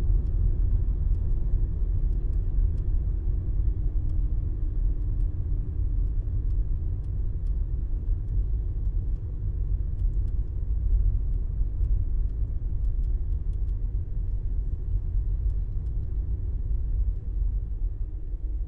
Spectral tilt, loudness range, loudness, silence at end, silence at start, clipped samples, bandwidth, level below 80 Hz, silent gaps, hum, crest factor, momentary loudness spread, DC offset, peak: -11.5 dB/octave; 2 LU; -31 LUFS; 0 s; 0 s; under 0.1%; 1.3 kHz; -26 dBFS; none; none; 12 dB; 4 LU; under 0.1%; -14 dBFS